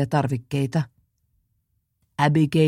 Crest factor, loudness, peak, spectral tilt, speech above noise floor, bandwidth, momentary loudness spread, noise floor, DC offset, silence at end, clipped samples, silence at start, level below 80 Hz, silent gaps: 20 dB; -23 LUFS; -4 dBFS; -7.5 dB/octave; 51 dB; 12.5 kHz; 13 LU; -71 dBFS; under 0.1%; 0 s; under 0.1%; 0 s; -58 dBFS; none